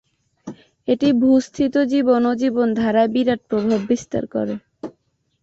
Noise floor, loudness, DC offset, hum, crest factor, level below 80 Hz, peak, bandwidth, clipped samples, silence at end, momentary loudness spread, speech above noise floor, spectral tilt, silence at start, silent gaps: -66 dBFS; -19 LUFS; under 0.1%; none; 14 dB; -56 dBFS; -6 dBFS; 7.8 kHz; under 0.1%; 0.5 s; 20 LU; 48 dB; -6 dB/octave; 0.45 s; none